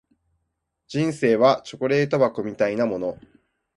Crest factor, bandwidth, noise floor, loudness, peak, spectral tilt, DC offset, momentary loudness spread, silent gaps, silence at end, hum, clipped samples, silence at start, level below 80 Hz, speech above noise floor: 20 dB; 11.5 kHz; -77 dBFS; -22 LUFS; -4 dBFS; -6.5 dB/octave; under 0.1%; 9 LU; none; 0.6 s; none; under 0.1%; 0.9 s; -62 dBFS; 56 dB